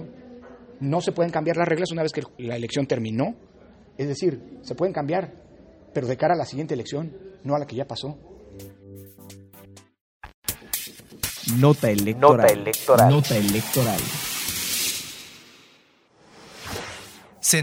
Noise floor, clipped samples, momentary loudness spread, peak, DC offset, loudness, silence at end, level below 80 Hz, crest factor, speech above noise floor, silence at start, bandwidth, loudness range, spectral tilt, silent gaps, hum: -58 dBFS; under 0.1%; 24 LU; -2 dBFS; under 0.1%; -23 LUFS; 0 s; -54 dBFS; 22 dB; 36 dB; 0 s; 16.5 kHz; 14 LU; -4.5 dB/octave; 10.01-10.20 s, 10.34-10.42 s; none